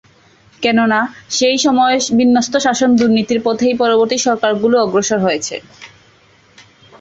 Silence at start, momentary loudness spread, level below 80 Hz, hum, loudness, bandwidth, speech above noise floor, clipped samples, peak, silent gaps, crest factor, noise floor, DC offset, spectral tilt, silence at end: 0.6 s; 5 LU; -54 dBFS; none; -14 LUFS; 8 kHz; 36 dB; under 0.1%; -2 dBFS; none; 14 dB; -49 dBFS; under 0.1%; -3.5 dB/octave; 1.15 s